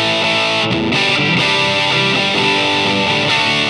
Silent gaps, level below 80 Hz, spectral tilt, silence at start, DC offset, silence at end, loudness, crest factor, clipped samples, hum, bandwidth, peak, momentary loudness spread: none; -48 dBFS; -3.5 dB/octave; 0 s; under 0.1%; 0 s; -13 LUFS; 12 dB; under 0.1%; none; 12 kHz; -2 dBFS; 2 LU